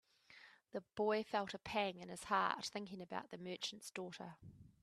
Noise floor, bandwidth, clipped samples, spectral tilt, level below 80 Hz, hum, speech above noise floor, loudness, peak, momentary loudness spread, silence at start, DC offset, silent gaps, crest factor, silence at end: -65 dBFS; 14 kHz; under 0.1%; -3.5 dB/octave; -78 dBFS; none; 22 dB; -43 LUFS; -20 dBFS; 21 LU; 0.3 s; under 0.1%; none; 24 dB; 0.15 s